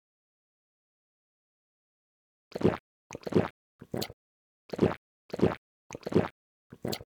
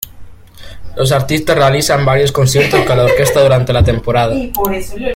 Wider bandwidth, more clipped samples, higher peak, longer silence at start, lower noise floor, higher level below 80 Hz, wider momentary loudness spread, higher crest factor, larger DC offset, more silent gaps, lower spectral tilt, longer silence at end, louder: first, 19.5 kHz vs 16.5 kHz; neither; second, -10 dBFS vs 0 dBFS; first, 2.55 s vs 0 s; first, under -90 dBFS vs -33 dBFS; second, -60 dBFS vs -30 dBFS; first, 13 LU vs 7 LU; first, 24 dB vs 12 dB; neither; first, 2.80-3.10 s, 3.50-3.79 s, 4.13-4.69 s, 4.97-5.29 s, 5.58-5.90 s, 6.31-6.70 s vs none; first, -6.5 dB/octave vs -5 dB/octave; about the same, 0 s vs 0 s; second, -32 LUFS vs -12 LUFS